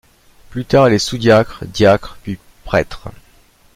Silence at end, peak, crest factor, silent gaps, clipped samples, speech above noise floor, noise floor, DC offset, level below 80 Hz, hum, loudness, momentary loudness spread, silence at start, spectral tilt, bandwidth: 0.65 s; 0 dBFS; 16 dB; none; under 0.1%; 35 dB; -50 dBFS; under 0.1%; -38 dBFS; none; -14 LUFS; 18 LU; 0.5 s; -5.5 dB/octave; 16 kHz